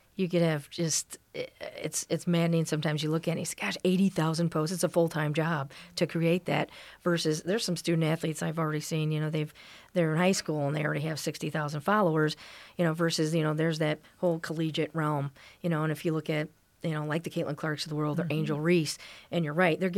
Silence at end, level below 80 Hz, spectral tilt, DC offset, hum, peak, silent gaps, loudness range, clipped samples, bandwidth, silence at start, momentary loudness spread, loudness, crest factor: 0 s; -70 dBFS; -5.5 dB/octave; under 0.1%; none; -12 dBFS; none; 3 LU; under 0.1%; 15.5 kHz; 0.2 s; 8 LU; -30 LUFS; 18 dB